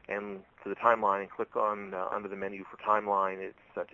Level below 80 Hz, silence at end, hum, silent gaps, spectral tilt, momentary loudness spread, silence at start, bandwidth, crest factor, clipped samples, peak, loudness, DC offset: -72 dBFS; 0.05 s; none; none; -7 dB/octave; 14 LU; 0.1 s; 7.4 kHz; 24 dB; under 0.1%; -8 dBFS; -32 LUFS; under 0.1%